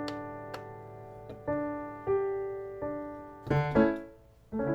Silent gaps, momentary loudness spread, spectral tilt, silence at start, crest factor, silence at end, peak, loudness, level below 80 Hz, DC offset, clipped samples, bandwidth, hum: none; 19 LU; -8.5 dB/octave; 0 s; 20 dB; 0 s; -12 dBFS; -33 LUFS; -54 dBFS; under 0.1%; under 0.1%; 18.5 kHz; none